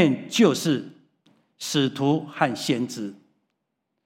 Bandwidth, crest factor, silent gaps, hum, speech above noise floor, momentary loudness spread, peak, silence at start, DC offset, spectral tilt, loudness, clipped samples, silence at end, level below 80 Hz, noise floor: 16.5 kHz; 20 dB; none; none; 56 dB; 15 LU; -4 dBFS; 0 s; under 0.1%; -5 dB/octave; -24 LUFS; under 0.1%; 0.9 s; -76 dBFS; -79 dBFS